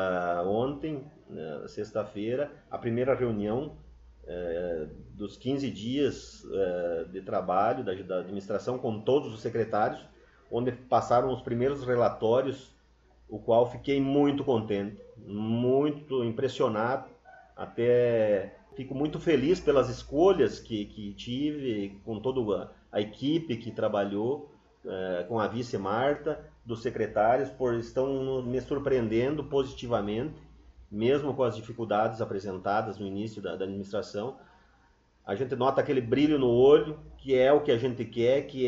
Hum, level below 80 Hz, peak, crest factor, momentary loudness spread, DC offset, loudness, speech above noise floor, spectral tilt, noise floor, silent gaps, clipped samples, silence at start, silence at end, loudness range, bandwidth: none; -56 dBFS; -8 dBFS; 20 dB; 13 LU; under 0.1%; -29 LUFS; 36 dB; -7 dB/octave; -64 dBFS; none; under 0.1%; 0 s; 0 s; 6 LU; 7.8 kHz